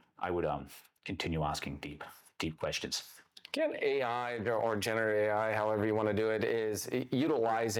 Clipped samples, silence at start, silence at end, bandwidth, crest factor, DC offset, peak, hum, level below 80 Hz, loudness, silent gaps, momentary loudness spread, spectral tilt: under 0.1%; 0.2 s; 0 s; 20 kHz; 16 dB; under 0.1%; -18 dBFS; none; -62 dBFS; -34 LUFS; none; 13 LU; -4.5 dB/octave